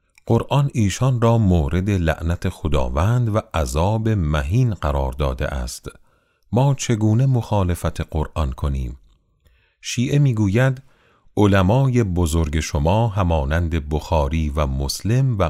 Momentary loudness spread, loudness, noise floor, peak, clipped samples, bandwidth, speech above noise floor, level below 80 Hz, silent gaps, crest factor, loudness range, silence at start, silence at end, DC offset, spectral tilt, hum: 8 LU; -20 LUFS; -59 dBFS; -2 dBFS; under 0.1%; 15 kHz; 40 dB; -30 dBFS; none; 18 dB; 3 LU; 0.25 s; 0 s; under 0.1%; -6.5 dB/octave; none